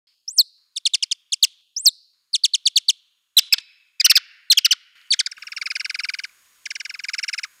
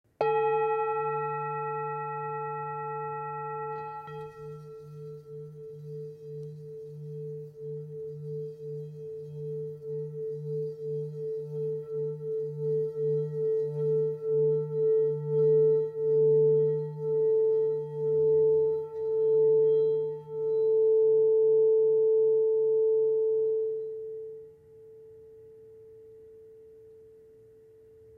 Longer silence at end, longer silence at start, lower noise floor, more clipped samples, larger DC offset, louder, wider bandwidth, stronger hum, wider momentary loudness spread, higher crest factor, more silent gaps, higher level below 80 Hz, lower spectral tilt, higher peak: second, 0.15 s vs 1.15 s; about the same, 0.25 s vs 0.2 s; second, -39 dBFS vs -55 dBFS; neither; neither; first, -18 LUFS vs -28 LUFS; first, 17 kHz vs 3.4 kHz; neither; second, 15 LU vs 18 LU; first, 20 dB vs 14 dB; neither; second, under -90 dBFS vs -76 dBFS; second, 10.5 dB/octave vs -9.5 dB/octave; first, -2 dBFS vs -14 dBFS